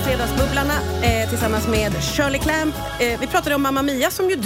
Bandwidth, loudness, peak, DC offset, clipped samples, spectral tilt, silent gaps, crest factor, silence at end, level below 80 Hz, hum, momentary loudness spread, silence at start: 16 kHz; -20 LUFS; -6 dBFS; under 0.1%; under 0.1%; -4.5 dB/octave; none; 14 dB; 0 s; -32 dBFS; none; 2 LU; 0 s